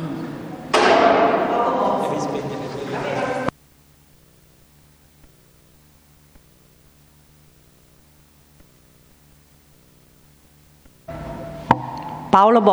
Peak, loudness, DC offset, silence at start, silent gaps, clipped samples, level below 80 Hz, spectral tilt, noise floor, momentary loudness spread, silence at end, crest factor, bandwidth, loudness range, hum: 0 dBFS; -20 LUFS; under 0.1%; 0 s; none; under 0.1%; -52 dBFS; -5.5 dB/octave; -53 dBFS; 19 LU; 0 s; 22 dB; over 20 kHz; 20 LU; none